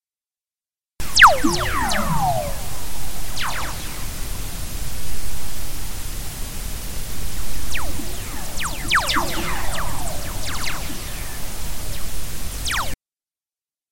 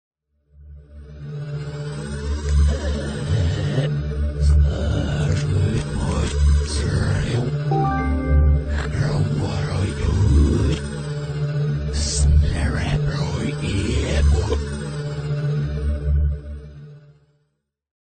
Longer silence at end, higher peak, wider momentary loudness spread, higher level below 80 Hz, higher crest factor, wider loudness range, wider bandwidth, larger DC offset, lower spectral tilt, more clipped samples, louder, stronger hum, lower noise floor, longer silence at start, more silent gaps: second, 0 s vs 1.15 s; first, 0 dBFS vs -6 dBFS; about the same, 11 LU vs 11 LU; second, -30 dBFS vs -24 dBFS; first, 20 dB vs 14 dB; first, 11 LU vs 4 LU; first, 17 kHz vs 9.4 kHz; neither; second, -2.5 dB/octave vs -6.5 dB/octave; neither; about the same, -23 LUFS vs -22 LUFS; neither; first, under -90 dBFS vs -71 dBFS; second, 0 s vs 0.6 s; neither